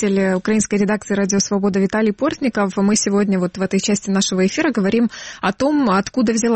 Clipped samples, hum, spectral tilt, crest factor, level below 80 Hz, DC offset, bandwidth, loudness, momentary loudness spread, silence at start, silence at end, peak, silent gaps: under 0.1%; none; -4.5 dB/octave; 12 dB; -50 dBFS; under 0.1%; 8.8 kHz; -18 LUFS; 3 LU; 0 s; 0 s; -6 dBFS; none